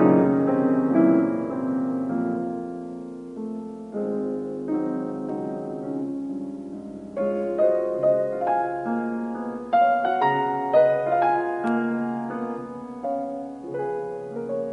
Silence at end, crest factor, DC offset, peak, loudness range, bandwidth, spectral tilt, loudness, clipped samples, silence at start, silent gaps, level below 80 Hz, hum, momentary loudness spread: 0 s; 18 dB; under 0.1%; -6 dBFS; 7 LU; 6.8 kHz; -9 dB/octave; -25 LUFS; under 0.1%; 0 s; none; -64 dBFS; none; 14 LU